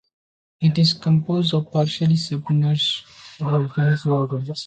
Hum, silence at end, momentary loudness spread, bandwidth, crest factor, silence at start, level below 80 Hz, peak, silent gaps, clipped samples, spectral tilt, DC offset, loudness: none; 0 s; 5 LU; 8.8 kHz; 14 dB; 0.6 s; -60 dBFS; -6 dBFS; none; under 0.1%; -6.5 dB/octave; under 0.1%; -20 LUFS